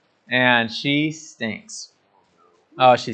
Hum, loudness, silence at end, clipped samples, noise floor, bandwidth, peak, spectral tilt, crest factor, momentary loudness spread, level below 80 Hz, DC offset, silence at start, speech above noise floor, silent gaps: none; -20 LUFS; 0 s; under 0.1%; -61 dBFS; 9 kHz; 0 dBFS; -4.5 dB/octave; 22 dB; 19 LU; -76 dBFS; under 0.1%; 0.3 s; 41 dB; none